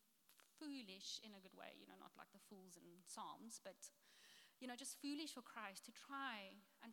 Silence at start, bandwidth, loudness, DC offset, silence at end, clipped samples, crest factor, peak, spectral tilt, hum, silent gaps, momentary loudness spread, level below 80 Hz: 0 s; 18 kHz; -55 LUFS; under 0.1%; 0 s; under 0.1%; 22 dB; -36 dBFS; -2 dB/octave; none; none; 14 LU; under -90 dBFS